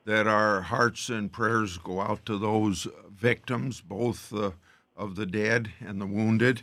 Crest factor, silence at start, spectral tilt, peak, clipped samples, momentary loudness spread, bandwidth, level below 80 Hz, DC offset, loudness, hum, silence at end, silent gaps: 20 dB; 0.05 s; -5.5 dB/octave; -8 dBFS; under 0.1%; 11 LU; 14.5 kHz; -60 dBFS; under 0.1%; -28 LUFS; none; 0 s; none